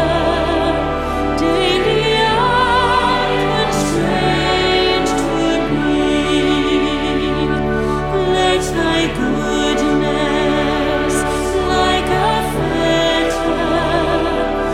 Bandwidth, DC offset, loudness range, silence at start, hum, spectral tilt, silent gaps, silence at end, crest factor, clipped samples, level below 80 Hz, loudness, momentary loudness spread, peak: 15.5 kHz; under 0.1%; 2 LU; 0 s; none; -5 dB/octave; none; 0 s; 12 dB; under 0.1%; -30 dBFS; -16 LUFS; 4 LU; -2 dBFS